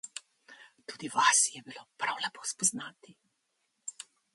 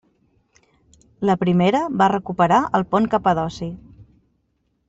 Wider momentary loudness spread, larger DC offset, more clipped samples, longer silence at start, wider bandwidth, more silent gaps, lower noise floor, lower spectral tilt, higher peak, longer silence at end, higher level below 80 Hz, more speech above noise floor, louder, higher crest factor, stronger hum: first, 23 LU vs 11 LU; neither; neither; second, 0.05 s vs 1.2 s; first, 12 kHz vs 8 kHz; neither; first, -79 dBFS vs -69 dBFS; second, 0.5 dB/octave vs -7 dB/octave; second, -10 dBFS vs -4 dBFS; second, 0.35 s vs 0.85 s; second, -86 dBFS vs -52 dBFS; about the same, 48 dB vs 50 dB; second, -28 LUFS vs -19 LUFS; first, 24 dB vs 18 dB; neither